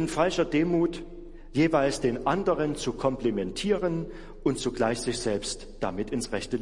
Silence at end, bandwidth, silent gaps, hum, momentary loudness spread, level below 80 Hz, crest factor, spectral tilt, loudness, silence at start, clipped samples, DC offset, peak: 0 s; 11.5 kHz; none; none; 9 LU; -44 dBFS; 18 dB; -5 dB/octave; -28 LUFS; 0 s; under 0.1%; under 0.1%; -10 dBFS